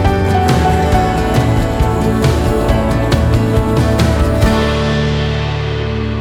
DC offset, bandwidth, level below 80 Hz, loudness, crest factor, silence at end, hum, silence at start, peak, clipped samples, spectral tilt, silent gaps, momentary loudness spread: under 0.1%; 16.5 kHz; -20 dBFS; -14 LUFS; 12 dB; 0 s; none; 0 s; 0 dBFS; under 0.1%; -6.5 dB/octave; none; 5 LU